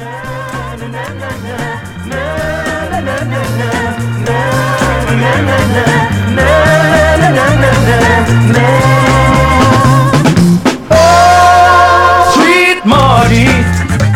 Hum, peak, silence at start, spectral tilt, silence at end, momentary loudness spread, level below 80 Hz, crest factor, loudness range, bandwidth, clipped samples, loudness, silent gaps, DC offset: none; 0 dBFS; 0 s; -5.5 dB/octave; 0 s; 15 LU; -24 dBFS; 8 dB; 10 LU; 16.5 kHz; 0.9%; -8 LUFS; none; under 0.1%